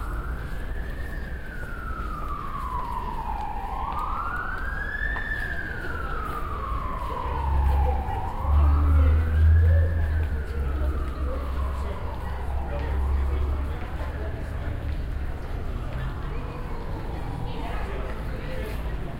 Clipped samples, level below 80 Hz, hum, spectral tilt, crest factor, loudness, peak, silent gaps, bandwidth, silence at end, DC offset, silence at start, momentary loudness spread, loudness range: under 0.1%; -28 dBFS; none; -7.5 dB/octave; 14 dB; -28 LUFS; -10 dBFS; none; 5.2 kHz; 0 s; under 0.1%; 0 s; 13 LU; 10 LU